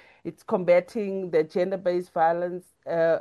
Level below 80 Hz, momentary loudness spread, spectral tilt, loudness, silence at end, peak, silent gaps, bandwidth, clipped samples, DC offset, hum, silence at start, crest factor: -72 dBFS; 12 LU; -7.5 dB/octave; -25 LUFS; 0 s; -8 dBFS; none; 12 kHz; under 0.1%; under 0.1%; none; 0.25 s; 16 dB